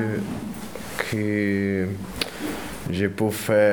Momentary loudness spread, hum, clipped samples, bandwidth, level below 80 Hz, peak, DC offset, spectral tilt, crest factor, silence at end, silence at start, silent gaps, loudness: 10 LU; none; under 0.1%; over 20 kHz; -50 dBFS; -4 dBFS; under 0.1%; -5.5 dB/octave; 20 dB; 0 s; 0 s; none; -26 LUFS